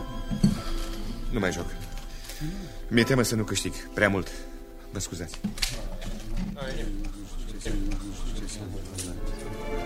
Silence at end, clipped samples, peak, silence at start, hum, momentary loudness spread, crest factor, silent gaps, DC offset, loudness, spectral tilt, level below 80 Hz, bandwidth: 0 s; under 0.1%; -6 dBFS; 0 s; none; 15 LU; 24 dB; none; under 0.1%; -31 LUFS; -4.5 dB/octave; -34 dBFS; 16 kHz